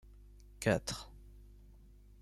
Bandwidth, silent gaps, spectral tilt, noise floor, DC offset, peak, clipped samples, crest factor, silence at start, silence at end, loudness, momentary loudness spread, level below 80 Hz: 15 kHz; none; -4.5 dB/octave; -58 dBFS; under 0.1%; -18 dBFS; under 0.1%; 24 dB; 0.1 s; 0.45 s; -36 LUFS; 26 LU; -56 dBFS